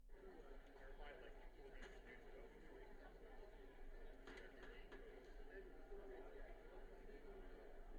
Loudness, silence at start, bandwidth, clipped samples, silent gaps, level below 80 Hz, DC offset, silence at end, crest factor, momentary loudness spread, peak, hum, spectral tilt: -62 LUFS; 0 s; 10 kHz; under 0.1%; none; -60 dBFS; under 0.1%; 0 s; 14 dB; 4 LU; -44 dBFS; none; -5.5 dB/octave